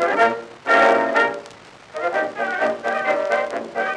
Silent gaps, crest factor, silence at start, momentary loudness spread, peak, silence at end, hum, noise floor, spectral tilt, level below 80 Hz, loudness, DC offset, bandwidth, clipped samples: none; 20 dB; 0 s; 11 LU; -2 dBFS; 0 s; none; -43 dBFS; -3.5 dB/octave; -68 dBFS; -20 LUFS; under 0.1%; 11 kHz; under 0.1%